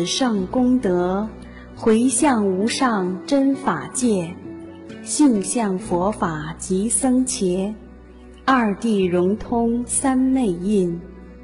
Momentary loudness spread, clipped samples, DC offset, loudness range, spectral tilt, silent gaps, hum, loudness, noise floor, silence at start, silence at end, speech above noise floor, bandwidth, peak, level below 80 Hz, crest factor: 14 LU; under 0.1%; under 0.1%; 2 LU; -4.5 dB/octave; none; none; -20 LUFS; -42 dBFS; 0 s; 0 s; 23 dB; 11.5 kHz; -6 dBFS; -44 dBFS; 14 dB